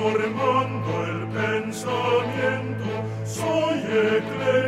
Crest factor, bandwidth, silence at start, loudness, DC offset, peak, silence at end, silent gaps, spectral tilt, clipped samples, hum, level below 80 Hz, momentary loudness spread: 14 dB; 14.5 kHz; 0 s; -24 LUFS; under 0.1%; -8 dBFS; 0 s; none; -5.5 dB/octave; under 0.1%; none; -60 dBFS; 6 LU